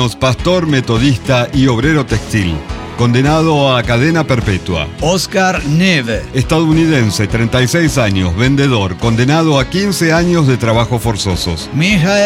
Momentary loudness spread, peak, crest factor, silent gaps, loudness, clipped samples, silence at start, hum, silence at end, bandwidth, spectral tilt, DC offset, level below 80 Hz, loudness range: 5 LU; 0 dBFS; 10 dB; none; -12 LUFS; under 0.1%; 0 s; none; 0 s; 16 kHz; -5.5 dB/octave; under 0.1%; -28 dBFS; 1 LU